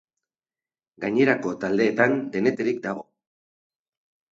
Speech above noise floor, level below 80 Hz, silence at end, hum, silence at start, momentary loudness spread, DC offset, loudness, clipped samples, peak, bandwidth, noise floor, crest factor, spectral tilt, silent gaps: over 67 dB; -68 dBFS; 1.3 s; none; 1 s; 11 LU; under 0.1%; -23 LUFS; under 0.1%; -4 dBFS; 7.8 kHz; under -90 dBFS; 20 dB; -6.5 dB/octave; none